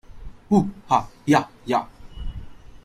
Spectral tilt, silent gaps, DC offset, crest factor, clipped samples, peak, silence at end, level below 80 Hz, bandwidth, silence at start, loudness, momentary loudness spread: -6.5 dB/octave; none; under 0.1%; 20 dB; under 0.1%; -4 dBFS; 0.1 s; -40 dBFS; 15 kHz; 0.15 s; -22 LUFS; 19 LU